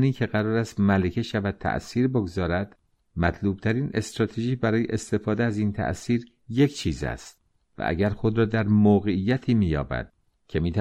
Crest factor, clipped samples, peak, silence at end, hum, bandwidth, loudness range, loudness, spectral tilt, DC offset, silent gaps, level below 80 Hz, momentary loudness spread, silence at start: 16 dB; under 0.1%; -8 dBFS; 0 s; none; 11.5 kHz; 3 LU; -25 LUFS; -7 dB/octave; under 0.1%; none; -44 dBFS; 9 LU; 0 s